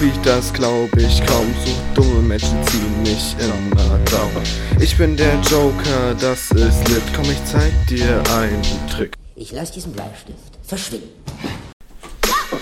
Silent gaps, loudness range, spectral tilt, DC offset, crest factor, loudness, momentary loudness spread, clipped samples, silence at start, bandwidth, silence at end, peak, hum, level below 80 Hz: 11.73-11.80 s; 9 LU; -5 dB/octave; under 0.1%; 16 dB; -17 LUFS; 14 LU; under 0.1%; 0 s; 16.5 kHz; 0 s; 0 dBFS; none; -22 dBFS